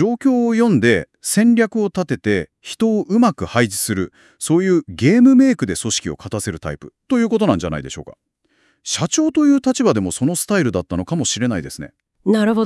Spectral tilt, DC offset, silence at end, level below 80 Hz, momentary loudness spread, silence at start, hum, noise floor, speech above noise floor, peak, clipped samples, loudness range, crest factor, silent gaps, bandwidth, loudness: -5 dB/octave; under 0.1%; 0 s; -50 dBFS; 14 LU; 0 s; none; -61 dBFS; 45 dB; 0 dBFS; under 0.1%; 4 LU; 18 dB; none; 12 kHz; -17 LUFS